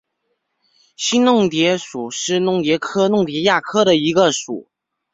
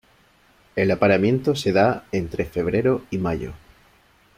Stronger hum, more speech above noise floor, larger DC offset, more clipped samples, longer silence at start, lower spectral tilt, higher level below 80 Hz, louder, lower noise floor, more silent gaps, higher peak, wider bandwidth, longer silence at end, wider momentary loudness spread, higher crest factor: neither; first, 55 dB vs 36 dB; neither; neither; first, 1 s vs 0.75 s; second, -4 dB/octave vs -7 dB/octave; second, -60 dBFS vs -48 dBFS; first, -17 LUFS vs -22 LUFS; first, -72 dBFS vs -57 dBFS; neither; about the same, -2 dBFS vs -4 dBFS; second, 8 kHz vs 15.5 kHz; second, 0.5 s vs 0.8 s; about the same, 9 LU vs 9 LU; about the same, 16 dB vs 18 dB